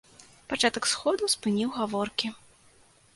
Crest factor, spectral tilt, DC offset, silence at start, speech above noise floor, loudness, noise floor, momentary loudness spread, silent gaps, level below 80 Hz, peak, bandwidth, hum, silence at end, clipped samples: 22 dB; -2.5 dB/octave; under 0.1%; 0.2 s; 32 dB; -27 LUFS; -59 dBFS; 7 LU; none; -64 dBFS; -8 dBFS; 12 kHz; none; 0.8 s; under 0.1%